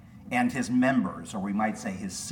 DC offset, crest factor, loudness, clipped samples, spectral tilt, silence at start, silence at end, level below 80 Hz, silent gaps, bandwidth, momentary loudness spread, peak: under 0.1%; 16 dB; -28 LUFS; under 0.1%; -5 dB/octave; 0 s; 0 s; -60 dBFS; none; 16.5 kHz; 10 LU; -14 dBFS